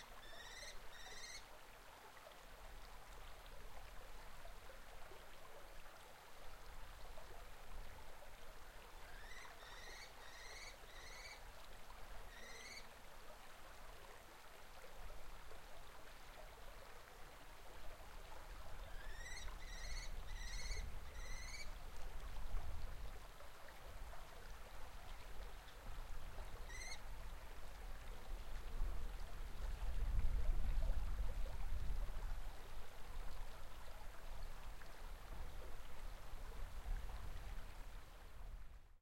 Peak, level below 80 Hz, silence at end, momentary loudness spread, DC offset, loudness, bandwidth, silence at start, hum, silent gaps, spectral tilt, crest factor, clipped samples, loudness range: -26 dBFS; -50 dBFS; 0 s; 10 LU; under 0.1%; -55 LUFS; 16.5 kHz; 0 s; none; none; -3.5 dB/octave; 20 dB; under 0.1%; 11 LU